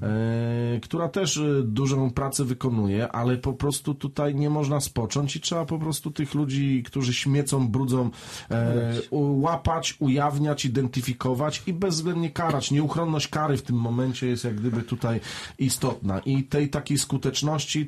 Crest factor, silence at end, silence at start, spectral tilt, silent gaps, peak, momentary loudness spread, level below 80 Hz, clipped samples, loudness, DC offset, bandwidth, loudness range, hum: 14 dB; 0 s; 0 s; -5.5 dB/octave; none; -12 dBFS; 4 LU; -50 dBFS; under 0.1%; -26 LUFS; under 0.1%; 13 kHz; 2 LU; none